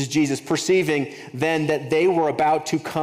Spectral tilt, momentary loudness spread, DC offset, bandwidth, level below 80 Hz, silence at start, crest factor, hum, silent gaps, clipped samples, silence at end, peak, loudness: -5 dB/octave; 6 LU; under 0.1%; 16 kHz; -62 dBFS; 0 s; 14 dB; none; none; under 0.1%; 0 s; -6 dBFS; -21 LUFS